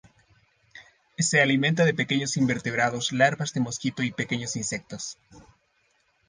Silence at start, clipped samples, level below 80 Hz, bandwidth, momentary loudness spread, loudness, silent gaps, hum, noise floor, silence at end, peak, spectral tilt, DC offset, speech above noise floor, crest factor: 0.75 s; under 0.1%; -64 dBFS; 10 kHz; 12 LU; -25 LUFS; none; none; -68 dBFS; 0.9 s; -6 dBFS; -4 dB/octave; under 0.1%; 43 dB; 20 dB